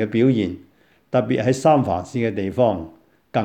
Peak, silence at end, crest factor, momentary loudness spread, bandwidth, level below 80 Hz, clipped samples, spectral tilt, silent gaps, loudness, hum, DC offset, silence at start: -4 dBFS; 0 s; 16 dB; 11 LU; 10.5 kHz; -54 dBFS; under 0.1%; -7 dB/octave; none; -20 LUFS; none; under 0.1%; 0 s